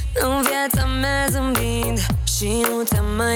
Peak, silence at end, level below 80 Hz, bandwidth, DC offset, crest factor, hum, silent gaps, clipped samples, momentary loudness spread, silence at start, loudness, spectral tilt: -4 dBFS; 0 s; -26 dBFS; over 20 kHz; under 0.1%; 16 dB; none; none; under 0.1%; 2 LU; 0 s; -20 LUFS; -4 dB/octave